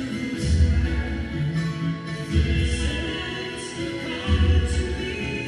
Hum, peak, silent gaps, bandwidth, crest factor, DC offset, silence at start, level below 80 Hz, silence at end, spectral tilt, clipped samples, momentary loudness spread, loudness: none; -8 dBFS; none; 11 kHz; 16 dB; under 0.1%; 0 s; -28 dBFS; 0 s; -6 dB/octave; under 0.1%; 9 LU; -25 LUFS